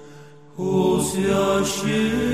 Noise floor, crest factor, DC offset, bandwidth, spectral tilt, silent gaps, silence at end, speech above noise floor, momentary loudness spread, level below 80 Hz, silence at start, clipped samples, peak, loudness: -45 dBFS; 14 dB; 0.3%; 15 kHz; -5 dB/octave; none; 0 s; 24 dB; 6 LU; -44 dBFS; 0 s; under 0.1%; -8 dBFS; -21 LUFS